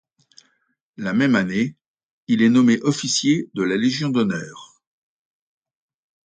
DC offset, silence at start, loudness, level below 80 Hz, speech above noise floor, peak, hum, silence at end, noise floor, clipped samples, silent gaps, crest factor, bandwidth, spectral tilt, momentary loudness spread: under 0.1%; 1 s; -20 LUFS; -64 dBFS; 44 dB; -6 dBFS; none; 1.6 s; -63 dBFS; under 0.1%; 1.86-1.94 s, 2.03-2.27 s; 16 dB; 9.4 kHz; -4.5 dB/octave; 10 LU